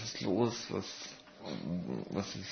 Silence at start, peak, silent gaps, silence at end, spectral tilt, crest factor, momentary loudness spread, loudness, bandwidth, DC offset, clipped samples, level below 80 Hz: 0 s; -16 dBFS; none; 0 s; -5 dB/octave; 20 dB; 13 LU; -37 LUFS; 6.4 kHz; under 0.1%; under 0.1%; -68 dBFS